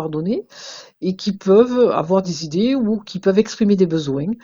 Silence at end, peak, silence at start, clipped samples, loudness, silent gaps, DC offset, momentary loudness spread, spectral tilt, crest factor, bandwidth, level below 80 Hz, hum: 0.1 s; -2 dBFS; 0 s; under 0.1%; -18 LUFS; none; under 0.1%; 11 LU; -6.5 dB/octave; 16 dB; 7.6 kHz; -54 dBFS; none